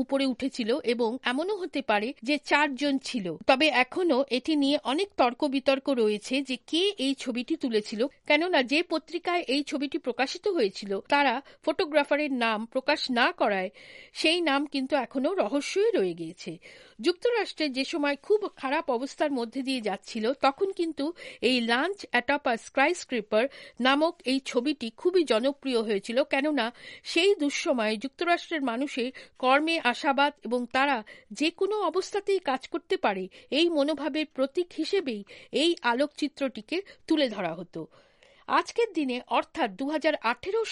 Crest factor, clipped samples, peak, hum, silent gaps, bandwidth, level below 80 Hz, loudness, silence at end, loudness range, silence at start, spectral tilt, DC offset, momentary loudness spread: 20 dB; under 0.1%; -8 dBFS; none; none; 11.5 kHz; -70 dBFS; -27 LUFS; 0 s; 3 LU; 0 s; -3.5 dB/octave; under 0.1%; 7 LU